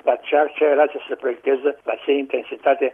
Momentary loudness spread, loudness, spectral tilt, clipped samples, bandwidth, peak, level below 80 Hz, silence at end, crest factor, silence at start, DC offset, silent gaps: 9 LU; -20 LUFS; -5.5 dB/octave; under 0.1%; 3.6 kHz; -4 dBFS; -72 dBFS; 0 s; 16 dB; 0.05 s; under 0.1%; none